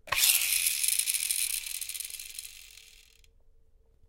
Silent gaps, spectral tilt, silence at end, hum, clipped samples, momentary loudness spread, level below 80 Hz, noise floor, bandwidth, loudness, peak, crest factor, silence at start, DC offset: none; 3.5 dB/octave; 1.1 s; none; under 0.1%; 19 LU; -60 dBFS; -61 dBFS; 17 kHz; -26 LUFS; -6 dBFS; 26 dB; 0.05 s; under 0.1%